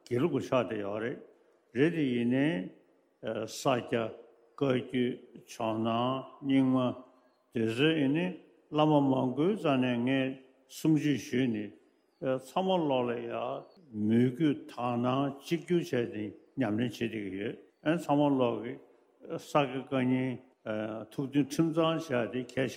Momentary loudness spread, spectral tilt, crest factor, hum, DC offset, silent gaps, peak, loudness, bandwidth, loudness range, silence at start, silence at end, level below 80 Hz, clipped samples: 12 LU; -6.5 dB/octave; 20 dB; none; under 0.1%; none; -12 dBFS; -31 LUFS; 15.5 kHz; 4 LU; 0.1 s; 0 s; -74 dBFS; under 0.1%